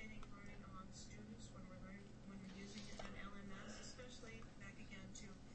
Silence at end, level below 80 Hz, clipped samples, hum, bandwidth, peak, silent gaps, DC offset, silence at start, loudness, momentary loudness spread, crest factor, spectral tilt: 0 s; -62 dBFS; under 0.1%; none; 8.4 kHz; -38 dBFS; none; under 0.1%; 0 s; -56 LUFS; 4 LU; 16 dB; -4.5 dB/octave